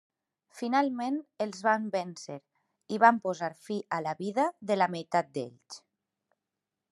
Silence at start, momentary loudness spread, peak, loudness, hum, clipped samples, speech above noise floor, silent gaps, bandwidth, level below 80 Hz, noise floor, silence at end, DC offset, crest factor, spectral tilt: 0.55 s; 19 LU; -6 dBFS; -30 LUFS; none; under 0.1%; 58 dB; none; 12 kHz; -86 dBFS; -88 dBFS; 1.15 s; under 0.1%; 24 dB; -5 dB/octave